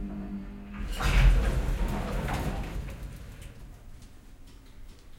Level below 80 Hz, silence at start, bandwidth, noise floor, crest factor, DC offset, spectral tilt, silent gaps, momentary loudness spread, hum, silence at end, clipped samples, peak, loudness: -30 dBFS; 0 s; 15.5 kHz; -48 dBFS; 18 dB; under 0.1%; -6 dB/octave; none; 26 LU; none; 0.05 s; under 0.1%; -10 dBFS; -31 LUFS